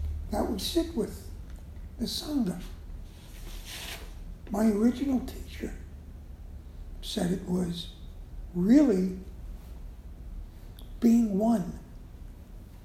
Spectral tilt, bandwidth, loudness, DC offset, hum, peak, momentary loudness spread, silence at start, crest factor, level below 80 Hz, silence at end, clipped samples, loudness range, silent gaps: -6 dB/octave; 15.5 kHz; -29 LUFS; under 0.1%; none; -10 dBFS; 23 LU; 0 s; 20 dB; -42 dBFS; 0 s; under 0.1%; 8 LU; none